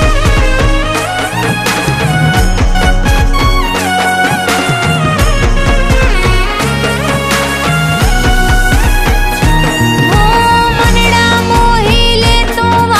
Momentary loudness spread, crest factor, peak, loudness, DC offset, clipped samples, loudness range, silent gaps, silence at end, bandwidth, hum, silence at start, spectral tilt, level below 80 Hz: 4 LU; 8 dB; 0 dBFS; -10 LUFS; under 0.1%; under 0.1%; 3 LU; none; 0 s; 15.5 kHz; none; 0 s; -4.5 dB/octave; -14 dBFS